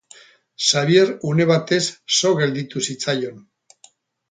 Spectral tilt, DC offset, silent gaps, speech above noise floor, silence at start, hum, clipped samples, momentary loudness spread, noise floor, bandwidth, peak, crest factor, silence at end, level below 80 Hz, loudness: -4 dB/octave; under 0.1%; none; 35 dB; 0.6 s; none; under 0.1%; 9 LU; -54 dBFS; 9.6 kHz; -2 dBFS; 18 dB; 0.9 s; -64 dBFS; -19 LUFS